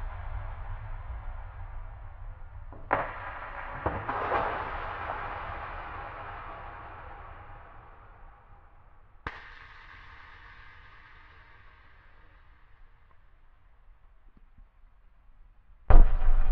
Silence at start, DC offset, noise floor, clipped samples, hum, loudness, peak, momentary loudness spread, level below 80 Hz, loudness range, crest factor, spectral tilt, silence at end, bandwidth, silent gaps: 0 s; under 0.1%; -56 dBFS; under 0.1%; none; -34 LUFS; -2 dBFS; 24 LU; -30 dBFS; 20 LU; 26 dB; -5 dB/octave; 0 s; 3.9 kHz; none